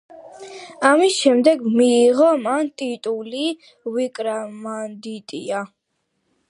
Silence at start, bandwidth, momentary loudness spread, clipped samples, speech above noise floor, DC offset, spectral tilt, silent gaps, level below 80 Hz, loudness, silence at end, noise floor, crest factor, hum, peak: 0.15 s; 11.5 kHz; 18 LU; under 0.1%; 53 dB; under 0.1%; -3.5 dB/octave; none; -76 dBFS; -19 LUFS; 0.85 s; -73 dBFS; 20 dB; none; 0 dBFS